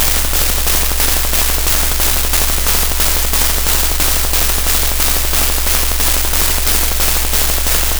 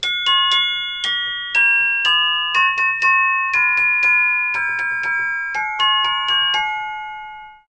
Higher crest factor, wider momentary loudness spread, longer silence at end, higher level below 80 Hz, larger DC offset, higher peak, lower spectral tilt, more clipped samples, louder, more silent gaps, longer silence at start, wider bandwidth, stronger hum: about the same, 12 dB vs 14 dB; second, 1 LU vs 8 LU; second, 0 s vs 0.2 s; first, -18 dBFS vs -56 dBFS; neither; first, 0 dBFS vs -4 dBFS; first, -1.5 dB/octave vs 1.5 dB/octave; first, 1% vs under 0.1%; first, -12 LUFS vs -15 LUFS; neither; about the same, 0 s vs 0 s; first, over 20 kHz vs 9.8 kHz; neither